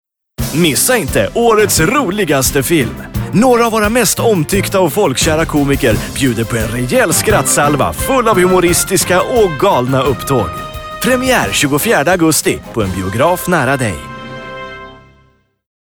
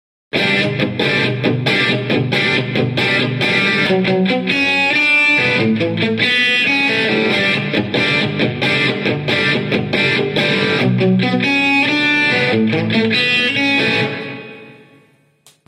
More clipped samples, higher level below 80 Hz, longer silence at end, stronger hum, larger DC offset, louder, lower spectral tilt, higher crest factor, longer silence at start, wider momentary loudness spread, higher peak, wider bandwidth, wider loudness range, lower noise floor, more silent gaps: neither; first, -32 dBFS vs -56 dBFS; about the same, 0.85 s vs 0.95 s; neither; neither; about the same, -12 LUFS vs -14 LUFS; second, -4 dB/octave vs -5.5 dB/octave; about the same, 10 dB vs 14 dB; about the same, 0.4 s vs 0.35 s; first, 9 LU vs 5 LU; about the same, -2 dBFS vs -2 dBFS; first, over 20 kHz vs 13.5 kHz; about the same, 2 LU vs 2 LU; about the same, -52 dBFS vs -52 dBFS; neither